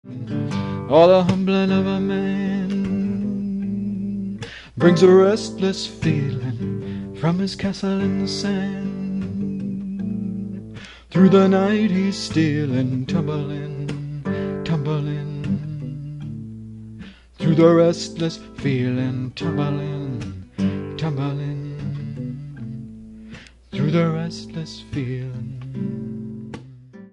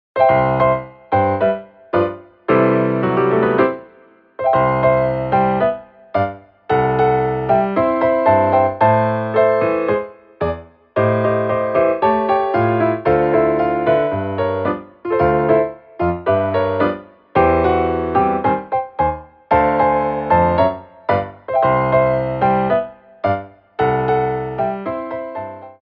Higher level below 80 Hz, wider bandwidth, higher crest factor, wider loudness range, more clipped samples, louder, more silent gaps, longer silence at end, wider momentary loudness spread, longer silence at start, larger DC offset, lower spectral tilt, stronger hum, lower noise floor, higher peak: second, -48 dBFS vs -42 dBFS; first, 10.5 kHz vs 5.4 kHz; about the same, 20 dB vs 16 dB; first, 8 LU vs 2 LU; neither; second, -21 LUFS vs -17 LUFS; neither; about the same, 0.05 s vs 0.1 s; first, 19 LU vs 10 LU; about the same, 0.05 s vs 0.15 s; neither; second, -7 dB/octave vs -10 dB/octave; neither; second, -42 dBFS vs -49 dBFS; about the same, -2 dBFS vs -2 dBFS